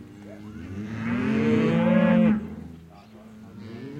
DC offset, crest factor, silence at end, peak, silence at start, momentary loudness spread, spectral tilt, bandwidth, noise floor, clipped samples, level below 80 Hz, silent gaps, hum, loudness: under 0.1%; 18 dB; 0 s; -8 dBFS; 0 s; 23 LU; -8.5 dB/octave; 7.4 kHz; -47 dBFS; under 0.1%; -56 dBFS; none; none; -23 LUFS